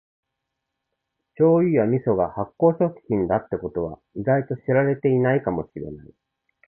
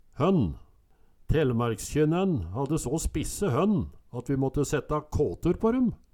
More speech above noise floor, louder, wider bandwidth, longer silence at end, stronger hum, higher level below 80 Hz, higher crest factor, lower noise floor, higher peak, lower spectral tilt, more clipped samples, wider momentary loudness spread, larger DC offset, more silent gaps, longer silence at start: first, 59 dB vs 32 dB; first, -22 LUFS vs -28 LUFS; second, 3.2 kHz vs 18.5 kHz; first, 0.65 s vs 0.2 s; neither; second, -52 dBFS vs -40 dBFS; about the same, 18 dB vs 16 dB; first, -81 dBFS vs -59 dBFS; first, -6 dBFS vs -12 dBFS; first, -13.5 dB/octave vs -6.5 dB/octave; neither; first, 11 LU vs 6 LU; neither; neither; first, 1.4 s vs 0.15 s